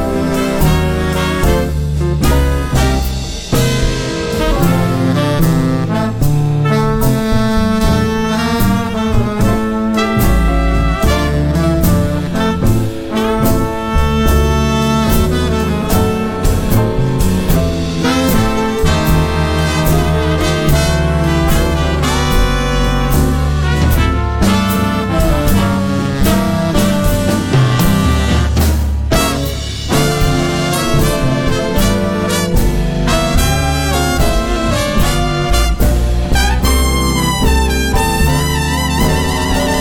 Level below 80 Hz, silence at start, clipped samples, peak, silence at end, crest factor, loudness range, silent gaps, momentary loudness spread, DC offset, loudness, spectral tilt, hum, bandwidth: -18 dBFS; 0 s; under 0.1%; -2 dBFS; 0 s; 10 dB; 1 LU; none; 3 LU; under 0.1%; -14 LUFS; -5.5 dB/octave; none; 18 kHz